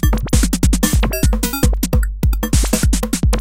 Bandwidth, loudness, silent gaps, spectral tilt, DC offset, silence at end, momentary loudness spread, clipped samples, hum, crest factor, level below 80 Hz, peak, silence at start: 17 kHz; -17 LUFS; none; -5 dB/octave; 3%; 0 s; 3 LU; under 0.1%; none; 14 dB; -18 dBFS; 0 dBFS; 0 s